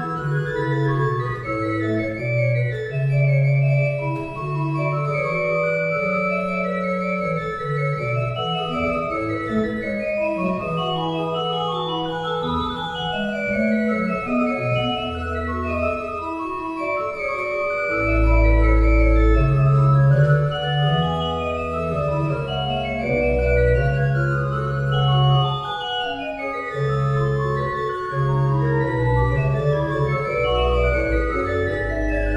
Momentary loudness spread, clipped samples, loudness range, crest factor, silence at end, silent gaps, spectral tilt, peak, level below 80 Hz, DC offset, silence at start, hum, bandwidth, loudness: 7 LU; under 0.1%; 5 LU; 14 dB; 0 s; none; -8 dB/octave; -6 dBFS; -28 dBFS; under 0.1%; 0 s; none; 7.4 kHz; -21 LUFS